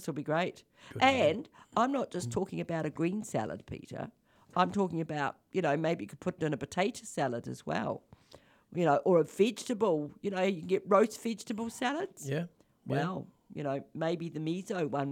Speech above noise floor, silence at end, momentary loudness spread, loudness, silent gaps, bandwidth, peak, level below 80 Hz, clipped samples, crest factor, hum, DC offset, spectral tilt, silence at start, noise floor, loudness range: 28 dB; 0 s; 12 LU; -32 LUFS; none; 16.5 kHz; -12 dBFS; -70 dBFS; under 0.1%; 20 dB; none; under 0.1%; -5.5 dB/octave; 0 s; -60 dBFS; 5 LU